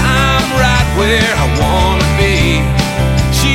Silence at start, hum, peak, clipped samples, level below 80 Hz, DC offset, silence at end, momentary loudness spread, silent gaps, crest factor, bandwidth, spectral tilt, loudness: 0 s; none; 0 dBFS; under 0.1%; -18 dBFS; under 0.1%; 0 s; 3 LU; none; 12 dB; 16.5 kHz; -4.5 dB/octave; -12 LUFS